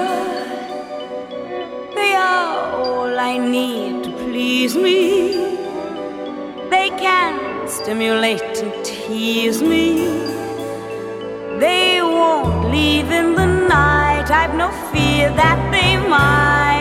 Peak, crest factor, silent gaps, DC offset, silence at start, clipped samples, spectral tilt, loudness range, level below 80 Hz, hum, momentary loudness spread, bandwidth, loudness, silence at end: -2 dBFS; 16 dB; none; under 0.1%; 0 s; under 0.1%; -5 dB/octave; 5 LU; -34 dBFS; none; 14 LU; 16.5 kHz; -17 LUFS; 0 s